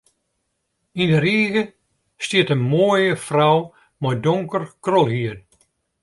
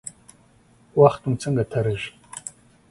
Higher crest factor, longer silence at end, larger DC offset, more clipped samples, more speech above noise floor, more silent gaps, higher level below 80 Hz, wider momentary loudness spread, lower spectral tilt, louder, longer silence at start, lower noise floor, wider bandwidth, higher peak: about the same, 18 dB vs 22 dB; first, 0.65 s vs 0.4 s; neither; neither; first, 55 dB vs 36 dB; neither; about the same, -58 dBFS vs -54 dBFS; second, 13 LU vs 19 LU; about the same, -6 dB/octave vs -6.5 dB/octave; first, -19 LUFS vs -22 LUFS; first, 0.95 s vs 0.05 s; first, -73 dBFS vs -56 dBFS; about the same, 11.5 kHz vs 11.5 kHz; about the same, -4 dBFS vs -2 dBFS